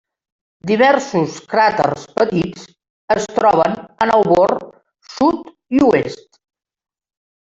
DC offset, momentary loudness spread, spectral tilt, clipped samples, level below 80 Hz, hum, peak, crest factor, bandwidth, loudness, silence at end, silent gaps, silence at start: under 0.1%; 12 LU; -5.5 dB/octave; under 0.1%; -52 dBFS; none; 0 dBFS; 16 dB; 8 kHz; -16 LUFS; 1.3 s; 2.90-3.08 s; 0.65 s